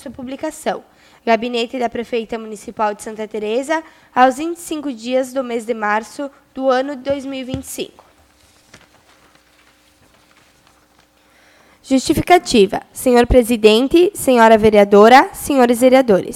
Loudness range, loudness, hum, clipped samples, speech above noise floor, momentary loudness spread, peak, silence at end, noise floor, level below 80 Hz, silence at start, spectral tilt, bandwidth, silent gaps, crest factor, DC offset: 14 LU; -15 LUFS; none; 0.1%; 39 dB; 17 LU; 0 dBFS; 0 s; -54 dBFS; -38 dBFS; 0.05 s; -4.5 dB/octave; 16.5 kHz; none; 16 dB; under 0.1%